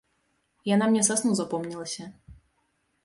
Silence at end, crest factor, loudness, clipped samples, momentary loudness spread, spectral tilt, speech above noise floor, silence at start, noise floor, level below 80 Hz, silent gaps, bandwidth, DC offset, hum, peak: 0.7 s; 22 dB; -25 LUFS; under 0.1%; 15 LU; -4 dB/octave; 47 dB; 0.65 s; -73 dBFS; -62 dBFS; none; 11.5 kHz; under 0.1%; none; -6 dBFS